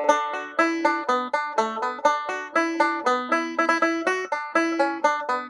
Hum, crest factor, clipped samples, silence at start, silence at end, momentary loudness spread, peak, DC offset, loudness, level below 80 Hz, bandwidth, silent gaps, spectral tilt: none; 18 dB; under 0.1%; 0 s; 0 s; 4 LU; -6 dBFS; under 0.1%; -23 LUFS; -78 dBFS; 11 kHz; none; -2.5 dB/octave